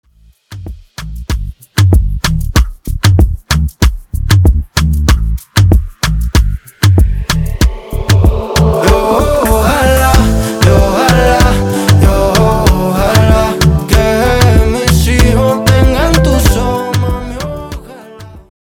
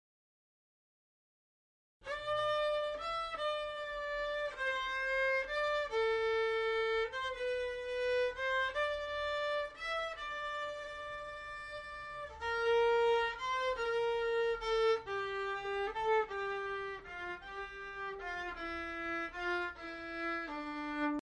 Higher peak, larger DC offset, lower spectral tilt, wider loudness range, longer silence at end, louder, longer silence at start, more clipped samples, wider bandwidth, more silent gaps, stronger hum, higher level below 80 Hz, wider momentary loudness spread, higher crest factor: first, 0 dBFS vs -22 dBFS; neither; first, -5.5 dB/octave vs -3.5 dB/octave; about the same, 4 LU vs 6 LU; first, 0.3 s vs 0.05 s; first, -11 LUFS vs -36 LUFS; second, 0.5 s vs 2 s; neither; first, 18 kHz vs 11 kHz; neither; neither; first, -14 dBFS vs -60 dBFS; about the same, 12 LU vs 11 LU; about the same, 10 dB vs 14 dB